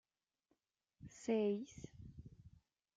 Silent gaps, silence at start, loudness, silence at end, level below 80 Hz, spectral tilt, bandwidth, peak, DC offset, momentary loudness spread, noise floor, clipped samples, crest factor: none; 1 s; -41 LUFS; 0.5 s; -70 dBFS; -6.5 dB/octave; 9.2 kHz; -26 dBFS; under 0.1%; 23 LU; -85 dBFS; under 0.1%; 20 dB